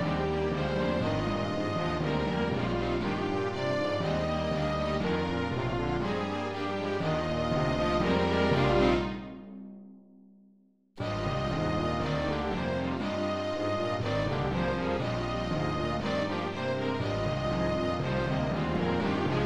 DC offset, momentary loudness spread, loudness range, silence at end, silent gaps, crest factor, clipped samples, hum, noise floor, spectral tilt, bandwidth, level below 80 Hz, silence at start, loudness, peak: 0.4%; 5 LU; 4 LU; 0 s; none; 18 dB; under 0.1%; none; -63 dBFS; -7 dB/octave; 11 kHz; -44 dBFS; 0 s; -30 LUFS; -12 dBFS